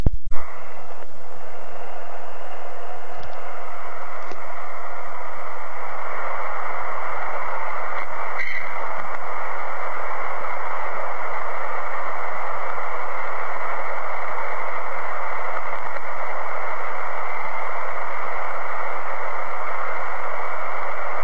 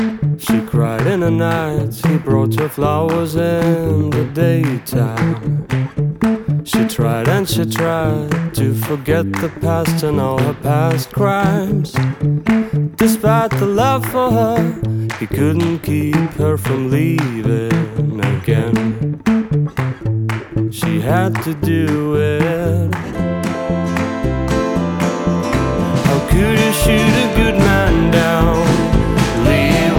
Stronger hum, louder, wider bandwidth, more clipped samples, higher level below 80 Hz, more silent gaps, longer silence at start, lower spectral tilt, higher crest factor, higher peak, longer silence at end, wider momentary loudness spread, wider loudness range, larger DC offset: neither; second, -29 LUFS vs -16 LUFS; second, 8.6 kHz vs 19.5 kHz; neither; second, -40 dBFS vs -30 dBFS; neither; about the same, 0 s vs 0 s; about the same, -5.5 dB/octave vs -6.5 dB/octave; first, 24 dB vs 14 dB; about the same, 0 dBFS vs 0 dBFS; about the same, 0 s vs 0 s; first, 9 LU vs 6 LU; first, 7 LU vs 4 LU; first, 20% vs under 0.1%